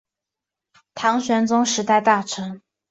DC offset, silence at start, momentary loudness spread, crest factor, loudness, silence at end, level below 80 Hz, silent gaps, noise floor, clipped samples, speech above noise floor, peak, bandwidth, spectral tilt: under 0.1%; 0.95 s; 17 LU; 18 dB; -20 LUFS; 0.35 s; -66 dBFS; none; -86 dBFS; under 0.1%; 67 dB; -4 dBFS; 8 kHz; -3.5 dB/octave